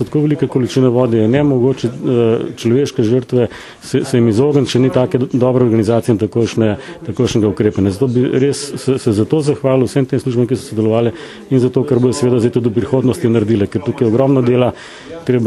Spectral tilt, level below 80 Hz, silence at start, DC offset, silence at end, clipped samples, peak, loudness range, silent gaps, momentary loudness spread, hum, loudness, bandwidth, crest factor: -7 dB/octave; -48 dBFS; 0 s; under 0.1%; 0 s; under 0.1%; 0 dBFS; 1 LU; none; 6 LU; none; -14 LUFS; 12.5 kHz; 14 dB